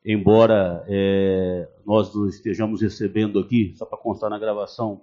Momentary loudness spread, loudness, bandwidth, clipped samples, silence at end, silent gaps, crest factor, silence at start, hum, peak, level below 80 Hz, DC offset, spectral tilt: 11 LU; -21 LUFS; 7.2 kHz; under 0.1%; 0.05 s; none; 20 dB; 0.05 s; none; -2 dBFS; -52 dBFS; under 0.1%; -6.5 dB/octave